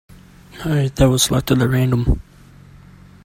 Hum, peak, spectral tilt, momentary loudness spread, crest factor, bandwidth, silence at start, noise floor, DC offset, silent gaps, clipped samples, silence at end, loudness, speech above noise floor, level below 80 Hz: none; 0 dBFS; -5 dB/octave; 8 LU; 18 dB; 16.5 kHz; 0.55 s; -44 dBFS; under 0.1%; none; under 0.1%; 1.05 s; -17 LUFS; 28 dB; -30 dBFS